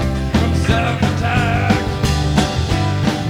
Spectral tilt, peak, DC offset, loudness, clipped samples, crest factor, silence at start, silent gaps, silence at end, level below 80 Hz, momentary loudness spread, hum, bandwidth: -6 dB/octave; -2 dBFS; under 0.1%; -17 LUFS; under 0.1%; 14 dB; 0 s; none; 0 s; -24 dBFS; 2 LU; none; 16 kHz